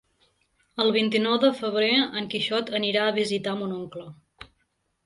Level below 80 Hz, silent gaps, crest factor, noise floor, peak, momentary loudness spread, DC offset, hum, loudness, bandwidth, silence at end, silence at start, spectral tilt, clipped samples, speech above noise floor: -66 dBFS; none; 18 dB; -73 dBFS; -8 dBFS; 12 LU; under 0.1%; none; -24 LUFS; 11.5 kHz; 0.6 s; 0.75 s; -5 dB/octave; under 0.1%; 48 dB